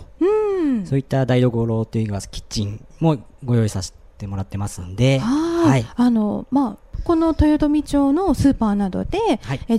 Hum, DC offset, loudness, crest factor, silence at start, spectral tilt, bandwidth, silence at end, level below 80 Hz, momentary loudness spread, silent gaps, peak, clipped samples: none; under 0.1%; -20 LUFS; 16 dB; 0 s; -7 dB/octave; 13.5 kHz; 0 s; -36 dBFS; 11 LU; none; -4 dBFS; under 0.1%